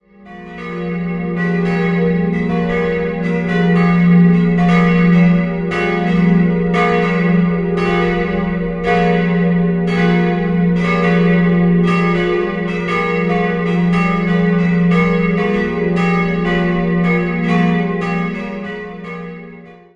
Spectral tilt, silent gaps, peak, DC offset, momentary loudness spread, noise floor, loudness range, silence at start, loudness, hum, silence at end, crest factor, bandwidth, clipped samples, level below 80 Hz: -8.5 dB/octave; none; -2 dBFS; under 0.1%; 9 LU; -37 dBFS; 4 LU; 0.2 s; -15 LUFS; none; 0.25 s; 12 dB; 7 kHz; under 0.1%; -38 dBFS